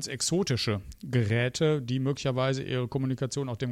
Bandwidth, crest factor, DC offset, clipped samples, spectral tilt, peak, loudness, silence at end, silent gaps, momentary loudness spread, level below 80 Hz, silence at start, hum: 14 kHz; 14 dB; under 0.1%; under 0.1%; -5 dB/octave; -14 dBFS; -29 LUFS; 0 s; none; 5 LU; -56 dBFS; 0 s; none